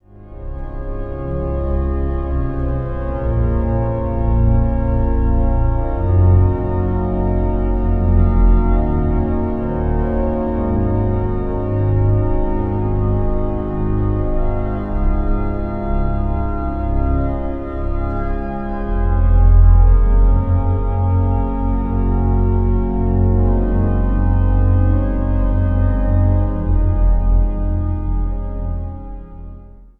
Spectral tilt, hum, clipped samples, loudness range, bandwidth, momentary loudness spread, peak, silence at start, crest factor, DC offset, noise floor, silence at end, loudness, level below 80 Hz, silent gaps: -12.5 dB/octave; none; under 0.1%; 5 LU; 2.9 kHz; 9 LU; 0 dBFS; 0.2 s; 14 dB; under 0.1%; -37 dBFS; 0.15 s; -18 LUFS; -18 dBFS; none